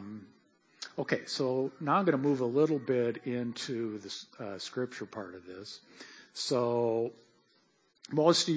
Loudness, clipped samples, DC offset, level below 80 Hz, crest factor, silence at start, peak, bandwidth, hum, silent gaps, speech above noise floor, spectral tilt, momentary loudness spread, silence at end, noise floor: -32 LUFS; under 0.1%; under 0.1%; -78 dBFS; 22 dB; 0 s; -12 dBFS; 8 kHz; none; none; 39 dB; -5 dB/octave; 18 LU; 0 s; -70 dBFS